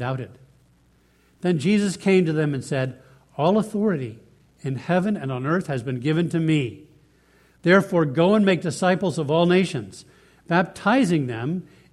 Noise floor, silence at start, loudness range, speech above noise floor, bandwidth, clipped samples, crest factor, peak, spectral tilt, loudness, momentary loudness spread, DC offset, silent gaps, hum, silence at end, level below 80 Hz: -59 dBFS; 0 s; 4 LU; 38 dB; 12.5 kHz; under 0.1%; 20 dB; -4 dBFS; -6.5 dB/octave; -22 LUFS; 13 LU; under 0.1%; none; none; 0.3 s; -60 dBFS